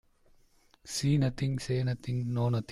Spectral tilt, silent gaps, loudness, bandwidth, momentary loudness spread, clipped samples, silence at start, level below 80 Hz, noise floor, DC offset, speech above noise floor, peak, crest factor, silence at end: -6 dB/octave; none; -31 LUFS; 13.5 kHz; 6 LU; under 0.1%; 0.85 s; -56 dBFS; -64 dBFS; under 0.1%; 34 dB; -16 dBFS; 14 dB; 0 s